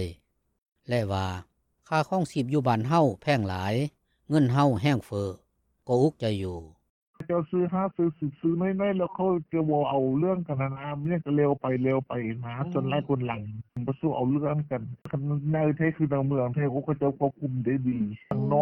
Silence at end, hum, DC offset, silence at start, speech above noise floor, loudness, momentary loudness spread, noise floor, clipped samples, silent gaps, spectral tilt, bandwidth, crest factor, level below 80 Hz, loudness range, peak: 0 s; none; under 0.1%; 0 s; 36 dB; -27 LUFS; 9 LU; -63 dBFS; under 0.1%; 0.62-0.72 s, 6.90-7.14 s; -8 dB/octave; 12 kHz; 16 dB; -60 dBFS; 3 LU; -10 dBFS